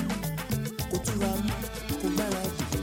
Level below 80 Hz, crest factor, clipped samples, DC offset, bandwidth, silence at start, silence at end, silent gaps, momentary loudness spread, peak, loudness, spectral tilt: -42 dBFS; 16 dB; under 0.1%; under 0.1%; 17 kHz; 0 s; 0 s; none; 4 LU; -14 dBFS; -30 LUFS; -5 dB/octave